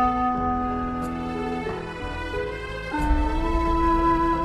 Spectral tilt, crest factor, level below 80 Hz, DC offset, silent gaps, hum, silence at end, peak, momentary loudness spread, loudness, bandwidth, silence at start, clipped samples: -7 dB/octave; 14 dB; -30 dBFS; under 0.1%; none; none; 0 s; -10 dBFS; 10 LU; -25 LUFS; 12.5 kHz; 0 s; under 0.1%